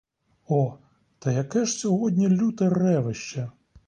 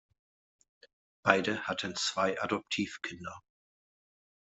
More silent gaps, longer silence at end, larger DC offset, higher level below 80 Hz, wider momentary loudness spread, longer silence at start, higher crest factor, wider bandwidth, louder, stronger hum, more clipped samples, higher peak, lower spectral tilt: neither; second, 0.35 s vs 1.05 s; neither; first, -62 dBFS vs -74 dBFS; second, 11 LU vs 15 LU; second, 0.5 s vs 1.25 s; second, 14 dB vs 32 dB; first, 10 kHz vs 8.2 kHz; first, -25 LUFS vs -32 LUFS; neither; neither; second, -10 dBFS vs -4 dBFS; first, -6.5 dB/octave vs -3.5 dB/octave